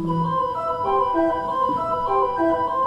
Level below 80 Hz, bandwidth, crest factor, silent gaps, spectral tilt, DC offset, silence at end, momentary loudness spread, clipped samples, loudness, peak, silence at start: -48 dBFS; 9.8 kHz; 12 dB; none; -8 dB/octave; under 0.1%; 0 s; 3 LU; under 0.1%; -22 LUFS; -8 dBFS; 0 s